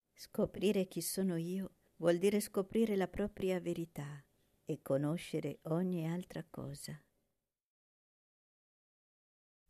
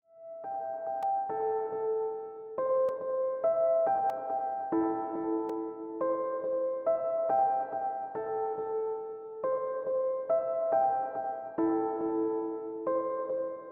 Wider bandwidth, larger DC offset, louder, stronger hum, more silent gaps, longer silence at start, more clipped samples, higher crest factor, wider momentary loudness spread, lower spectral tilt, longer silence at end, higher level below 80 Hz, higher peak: first, 14 kHz vs 3.5 kHz; neither; second, -38 LUFS vs -32 LUFS; neither; neither; about the same, 0.2 s vs 0.15 s; neither; first, 20 dB vs 14 dB; first, 14 LU vs 8 LU; about the same, -6 dB/octave vs -7 dB/octave; first, 2.7 s vs 0 s; first, -66 dBFS vs -74 dBFS; about the same, -20 dBFS vs -18 dBFS